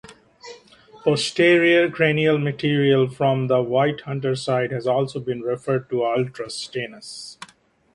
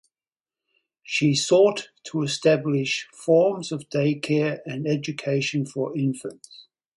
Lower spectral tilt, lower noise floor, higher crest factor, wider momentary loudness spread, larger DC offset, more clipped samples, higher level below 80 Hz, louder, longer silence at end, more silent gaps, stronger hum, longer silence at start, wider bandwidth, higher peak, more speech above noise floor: about the same, -6 dB/octave vs -5 dB/octave; second, -55 dBFS vs under -90 dBFS; about the same, 20 dB vs 18 dB; first, 14 LU vs 10 LU; neither; neither; first, -62 dBFS vs -68 dBFS; about the same, -21 LUFS vs -23 LUFS; first, 0.5 s vs 0.35 s; neither; neither; second, 0.1 s vs 1.05 s; about the same, 11.5 kHz vs 11.5 kHz; first, -2 dBFS vs -6 dBFS; second, 35 dB vs over 67 dB